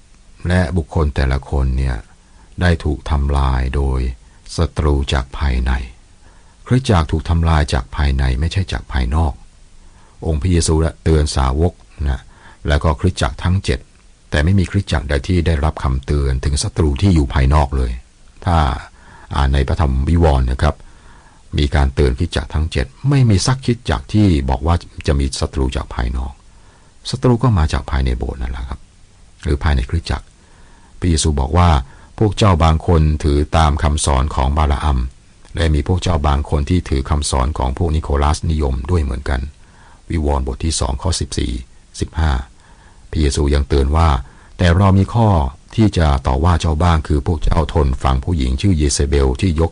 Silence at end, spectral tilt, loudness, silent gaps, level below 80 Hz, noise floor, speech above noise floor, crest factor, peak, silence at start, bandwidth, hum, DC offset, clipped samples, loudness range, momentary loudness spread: 0 s; -6 dB/octave; -17 LUFS; none; -20 dBFS; -44 dBFS; 29 dB; 12 dB; -4 dBFS; 0.4 s; 10.5 kHz; none; under 0.1%; under 0.1%; 5 LU; 10 LU